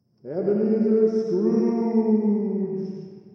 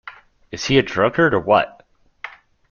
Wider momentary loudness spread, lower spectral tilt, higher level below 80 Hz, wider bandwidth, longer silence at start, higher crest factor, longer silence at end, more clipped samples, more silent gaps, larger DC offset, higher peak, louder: second, 11 LU vs 20 LU; first, -10 dB/octave vs -5 dB/octave; second, -80 dBFS vs -48 dBFS; second, 6.2 kHz vs 7.2 kHz; first, 0.25 s vs 0.05 s; about the same, 14 dB vs 18 dB; second, 0.05 s vs 0.4 s; neither; neither; neither; second, -8 dBFS vs -2 dBFS; second, -22 LUFS vs -18 LUFS